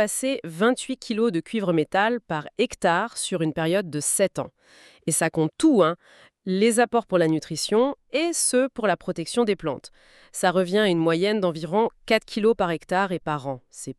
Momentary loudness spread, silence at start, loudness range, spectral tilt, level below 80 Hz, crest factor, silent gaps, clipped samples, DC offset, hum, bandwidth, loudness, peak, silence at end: 8 LU; 0 s; 2 LU; -4 dB/octave; -60 dBFS; 18 dB; none; under 0.1%; under 0.1%; none; 13.5 kHz; -23 LUFS; -6 dBFS; 0.05 s